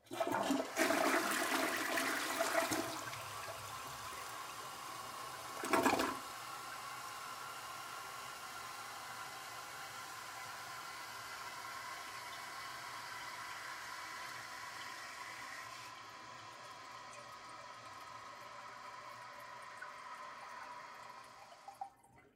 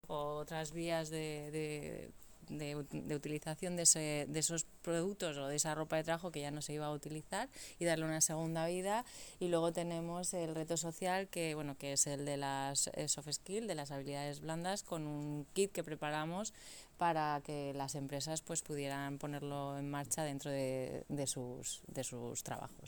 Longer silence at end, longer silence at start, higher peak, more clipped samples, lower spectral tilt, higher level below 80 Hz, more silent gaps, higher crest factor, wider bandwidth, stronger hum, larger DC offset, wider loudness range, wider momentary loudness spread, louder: about the same, 0.05 s vs 0 s; about the same, 0.05 s vs 0.05 s; about the same, -16 dBFS vs -14 dBFS; neither; second, -2 dB/octave vs -3.5 dB/octave; second, -78 dBFS vs -66 dBFS; neither; about the same, 26 dB vs 26 dB; second, 16 kHz vs over 20 kHz; neither; neither; first, 14 LU vs 5 LU; first, 16 LU vs 9 LU; second, -42 LUFS vs -39 LUFS